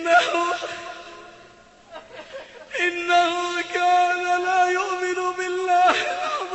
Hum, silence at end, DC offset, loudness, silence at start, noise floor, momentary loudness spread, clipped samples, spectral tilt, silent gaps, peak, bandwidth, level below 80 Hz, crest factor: none; 0 s; under 0.1%; -21 LUFS; 0 s; -50 dBFS; 21 LU; under 0.1%; -1.5 dB/octave; none; -4 dBFS; 8.4 kHz; -64 dBFS; 18 dB